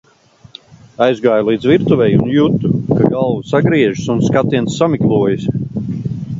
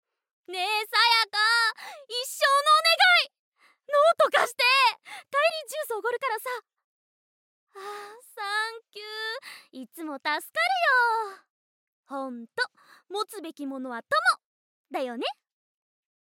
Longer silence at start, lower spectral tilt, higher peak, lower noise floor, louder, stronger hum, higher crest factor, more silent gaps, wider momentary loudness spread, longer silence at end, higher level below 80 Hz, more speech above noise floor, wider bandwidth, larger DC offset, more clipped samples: first, 1 s vs 0.5 s; first, -7.5 dB/octave vs 0.5 dB/octave; first, 0 dBFS vs -8 dBFS; second, -46 dBFS vs under -90 dBFS; first, -14 LUFS vs -24 LUFS; neither; second, 14 dB vs 20 dB; second, none vs 3.39-3.52 s, 6.84-7.67 s, 11.50-12.03 s, 14.45-14.84 s; second, 8 LU vs 20 LU; second, 0 s vs 0.95 s; first, -44 dBFS vs under -90 dBFS; second, 33 dB vs over 62 dB; second, 7.8 kHz vs 17 kHz; neither; neither